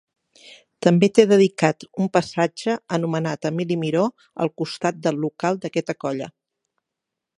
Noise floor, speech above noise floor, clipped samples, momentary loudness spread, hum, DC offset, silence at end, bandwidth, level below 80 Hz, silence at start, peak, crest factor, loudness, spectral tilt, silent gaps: -84 dBFS; 63 dB; under 0.1%; 11 LU; none; under 0.1%; 1.1 s; 11.5 kHz; -66 dBFS; 0.5 s; 0 dBFS; 22 dB; -21 LUFS; -6 dB/octave; none